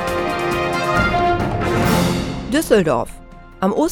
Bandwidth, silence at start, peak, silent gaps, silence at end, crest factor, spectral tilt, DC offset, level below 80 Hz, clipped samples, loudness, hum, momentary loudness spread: 18 kHz; 0 s; 0 dBFS; none; 0 s; 18 dB; -5.5 dB/octave; under 0.1%; -34 dBFS; under 0.1%; -18 LUFS; none; 6 LU